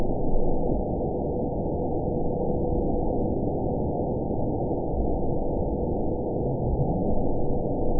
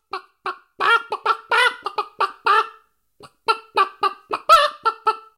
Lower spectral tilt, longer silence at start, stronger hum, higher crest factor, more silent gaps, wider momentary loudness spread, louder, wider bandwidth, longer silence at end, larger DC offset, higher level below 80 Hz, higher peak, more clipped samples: first, -18.5 dB/octave vs -0.5 dB/octave; second, 0 s vs 0.15 s; neither; about the same, 14 dB vs 18 dB; neither; second, 2 LU vs 16 LU; second, -28 LUFS vs -19 LUFS; second, 1 kHz vs 16.5 kHz; second, 0 s vs 0.2 s; first, 1% vs under 0.1%; first, -30 dBFS vs -60 dBFS; second, -12 dBFS vs -2 dBFS; neither